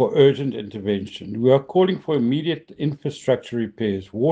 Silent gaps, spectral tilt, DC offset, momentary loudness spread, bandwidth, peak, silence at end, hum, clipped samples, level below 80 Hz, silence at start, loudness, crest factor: none; -7.5 dB/octave; under 0.1%; 10 LU; 8.8 kHz; -4 dBFS; 0 s; none; under 0.1%; -62 dBFS; 0 s; -22 LUFS; 18 dB